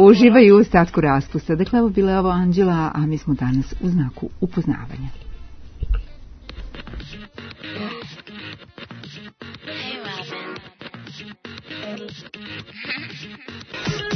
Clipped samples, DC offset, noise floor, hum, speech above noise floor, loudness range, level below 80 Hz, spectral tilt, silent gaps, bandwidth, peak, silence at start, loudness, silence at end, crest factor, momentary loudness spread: under 0.1%; under 0.1%; -39 dBFS; none; 23 dB; 15 LU; -36 dBFS; -7.5 dB/octave; none; 6.4 kHz; 0 dBFS; 0 s; -19 LUFS; 0 s; 20 dB; 21 LU